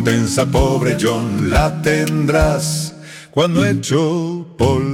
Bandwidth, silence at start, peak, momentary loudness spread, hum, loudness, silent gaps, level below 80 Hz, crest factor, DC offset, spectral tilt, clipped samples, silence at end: 16.5 kHz; 0 s; -2 dBFS; 7 LU; none; -16 LUFS; none; -28 dBFS; 14 dB; under 0.1%; -5.5 dB/octave; under 0.1%; 0 s